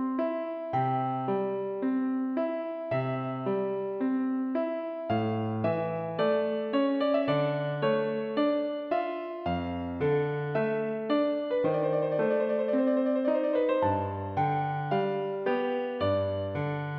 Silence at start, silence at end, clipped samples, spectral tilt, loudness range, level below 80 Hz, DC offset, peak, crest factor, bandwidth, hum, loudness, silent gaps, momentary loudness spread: 0 s; 0 s; under 0.1%; -10 dB/octave; 3 LU; -64 dBFS; under 0.1%; -14 dBFS; 14 dB; 5.2 kHz; none; -29 LUFS; none; 5 LU